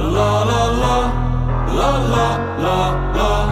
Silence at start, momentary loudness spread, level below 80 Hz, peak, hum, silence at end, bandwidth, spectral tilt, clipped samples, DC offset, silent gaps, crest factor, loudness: 0 s; 4 LU; -22 dBFS; -2 dBFS; none; 0 s; 14.5 kHz; -6 dB/octave; under 0.1%; under 0.1%; none; 12 dB; -17 LUFS